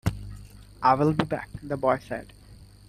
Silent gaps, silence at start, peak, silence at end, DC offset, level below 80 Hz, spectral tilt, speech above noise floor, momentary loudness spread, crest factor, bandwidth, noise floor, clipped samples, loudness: none; 0.05 s; -4 dBFS; 0.25 s; under 0.1%; -46 dBFS; -7 dB/octave; 24 dB; 20 LU; 22 dB; 14.5 kHz; -49 dBFS; under 0.1%; -26 LUFS